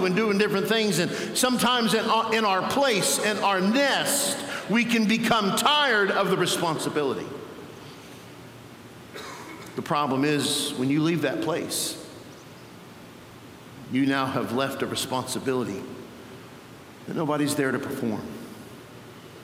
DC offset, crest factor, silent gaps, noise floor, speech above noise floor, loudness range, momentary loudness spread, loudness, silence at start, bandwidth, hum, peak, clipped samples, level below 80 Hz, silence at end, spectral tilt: under 0.1%; 22 dB; none; -45 dBFS; 21 dB; 8 LU; 23 LU; -24 LUFS; 0 s; 16.5 kHz; none; -4 dBFS; under 0.1%; -66 dBFS; 0 s; -3.5 dB/octave